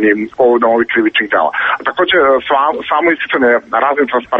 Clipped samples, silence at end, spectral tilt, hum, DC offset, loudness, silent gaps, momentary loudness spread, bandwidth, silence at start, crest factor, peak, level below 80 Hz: under 0.1%; 0 s; -6 dB/octave; none; under 0.1%; -12 LUFS; none; 4 LU; 5.6 kHz; 0 s; 12 dB; 0 dBFS; -52 dBFS